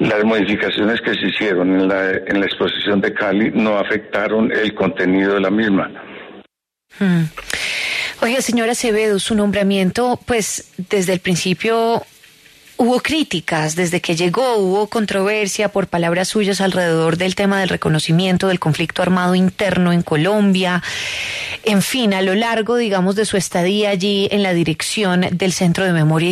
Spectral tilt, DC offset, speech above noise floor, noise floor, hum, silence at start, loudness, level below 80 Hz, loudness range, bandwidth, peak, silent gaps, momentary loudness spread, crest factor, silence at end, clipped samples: -5 dB/octave; under 0.1%; 43 dB; -60 dBFS; none; 0 s; -17 LUFS; -50 dBFS; 2 LU; 13.5 kHz; -4 dBFS; none; 4 LU; 12 dB; 0 s; under 0.1%